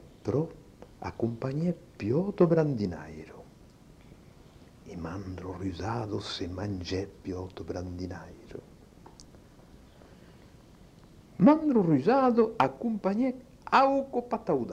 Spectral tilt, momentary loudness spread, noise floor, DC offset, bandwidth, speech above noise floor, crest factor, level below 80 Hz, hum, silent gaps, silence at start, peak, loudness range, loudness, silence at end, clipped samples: -7.5 dB/octave; 19 LU; -54 dBFS; under 0.1%; 10 kHz; 26 dB; 22 dB; -58 dBFS; none; none; 0.25 s; -8 dBFS; 16 LU; -29 LUFS; 0 s; under 0.1%